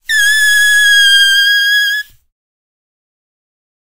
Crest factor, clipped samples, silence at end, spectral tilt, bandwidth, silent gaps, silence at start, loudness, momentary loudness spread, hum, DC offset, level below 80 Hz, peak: 12 dB; under 0.1%; 1.65 s; 5 dB/octave; 16 kHz; none; 0 s; -7 LUFS; 6 LU; none; under 0.1%; -52 dBFS; 0 dBFS